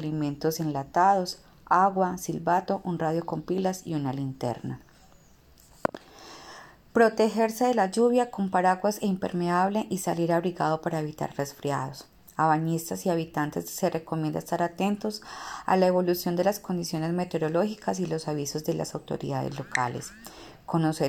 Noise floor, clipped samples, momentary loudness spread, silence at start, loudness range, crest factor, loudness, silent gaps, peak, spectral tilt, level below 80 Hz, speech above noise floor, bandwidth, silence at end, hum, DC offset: -56 dBFS; under 0.1%; 13 LU; 0 s; 5 LU; 22 dB; -27 LUFS; none; -6 dBFS; -5.5 dB/octave; -62 dBFS; 30 dB; 17.5 kHz; 0 s; none; under 0.1%